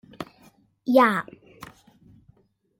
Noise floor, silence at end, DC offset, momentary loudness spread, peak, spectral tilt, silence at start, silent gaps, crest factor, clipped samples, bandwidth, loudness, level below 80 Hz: -61 dBFS; 1.15 s; under 0.1%; 27 LU; -6 dBFS; -6 dB/octave; 0.2 s; none; 22 dB; under 0.1%; 16.5 kHz; -21 LUFS; -66 dBFS